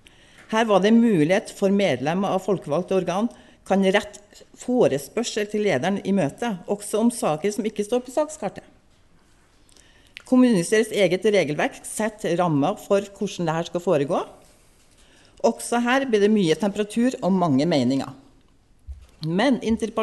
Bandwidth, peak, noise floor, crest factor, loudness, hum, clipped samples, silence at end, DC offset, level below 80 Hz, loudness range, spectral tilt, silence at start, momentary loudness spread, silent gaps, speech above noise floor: 12 kHz; -6 dBFS; -56 dBFS; 16 dB; -22 LUFS; none; under 0.1%; 0 s; under 0.1%; -54 dBFS; 4 LU; -5.5 dB/octave; 0.5 s; 8 LU; none; 35 dB